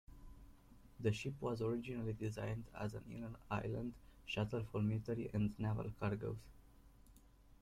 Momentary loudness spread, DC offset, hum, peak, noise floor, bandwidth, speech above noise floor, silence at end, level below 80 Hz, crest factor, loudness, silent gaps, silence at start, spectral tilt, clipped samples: 10 LU; under 0.1%; none; -24 dBFS; -65 dBFS; 13.5 kHz; 23 dB; 0.1 s; -62 dBFS; 20 dB; -43 LUFS; none; 0.1 s; -7.5 dB/octave; under 0.1%